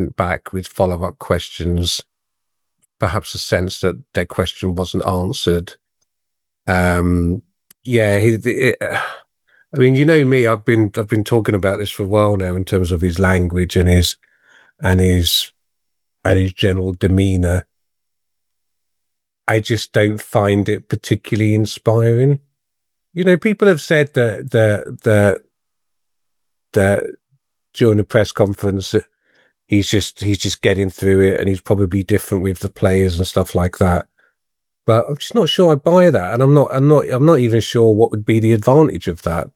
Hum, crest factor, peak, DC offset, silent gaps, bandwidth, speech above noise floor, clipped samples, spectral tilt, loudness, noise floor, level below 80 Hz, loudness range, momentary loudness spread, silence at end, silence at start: none; 16 dB; 0 dBFS; under 0.1%; none; 17 kHz; 65 dB; under 0.1%; -6 dB/octave; -16 LUFS; -80 dBFS; -44 dBFS; 7 LU; 9 LU; 0.1 s; 0 s